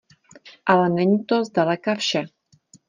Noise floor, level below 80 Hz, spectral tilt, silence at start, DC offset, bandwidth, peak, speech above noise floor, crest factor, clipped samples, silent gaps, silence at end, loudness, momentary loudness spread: -55 dBFS; -68 dBFS; -5.5 dB/octave; 0.45 s; under 0.1%; 9.6 kHz; -4 dBFS; 35 dB; 18 dB; under 0.1%; none; 0.6 s; -21 LUFS; 9 LU